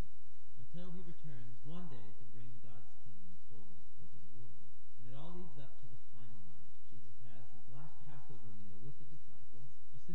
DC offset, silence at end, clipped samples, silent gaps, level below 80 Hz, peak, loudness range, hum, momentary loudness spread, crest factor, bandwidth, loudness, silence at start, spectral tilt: 5%; 0 s; under 0.1%; none; -70 dBFS; -26 dBFS; 4 LU; none; 11 LU; 18 dB; 7.6 kHz; -58 LUFS; 0 s; -8 dB/octave